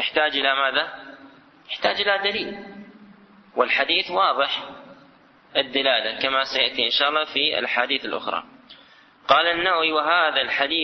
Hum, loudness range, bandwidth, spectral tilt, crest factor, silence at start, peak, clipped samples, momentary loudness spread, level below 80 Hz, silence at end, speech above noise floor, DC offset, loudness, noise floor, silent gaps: none; 3 LU; 6.4 kHz; -3 dB/octave; 20 dB; 0 s; -2 dBFS; under 0.1%; 12 LU; -62 dBFS; 0 s; 31 dB; under 0.1%; -21 LUFS; -53 dBFS; none